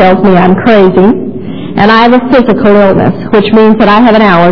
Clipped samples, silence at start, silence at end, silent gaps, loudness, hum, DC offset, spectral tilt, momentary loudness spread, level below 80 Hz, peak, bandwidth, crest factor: 10%; 0 s; 0 s; none; -5 LUFS; none; 8%; -8.5 dB/octave; 5 LU; -32 dBFS; 0 dBFS; 5.4 kHz; 6 dB